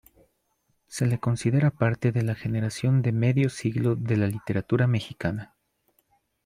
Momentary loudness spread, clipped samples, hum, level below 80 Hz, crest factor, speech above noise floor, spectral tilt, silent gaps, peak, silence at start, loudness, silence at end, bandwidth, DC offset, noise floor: 7 LU; under 0.1%; none; -58 dBFS; 18 dB; 48 dB; -7 dB/octave; none; -8 dBFS; 0.9 s; -25 LUFS; 1 s; 12.5 kHz; under 0.1%; -72 dBFS